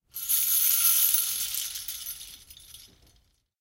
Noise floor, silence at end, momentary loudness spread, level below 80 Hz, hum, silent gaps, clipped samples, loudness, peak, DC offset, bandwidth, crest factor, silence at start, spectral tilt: -66 dBFS; 0.75 s; 18 LU; -62 dBFS; none; none; under 0.1%; -23 LUFS; -8 dBFS; under 0.1%; 17 kHz; 20 dB; 0.15 s; 3.5 dB/octave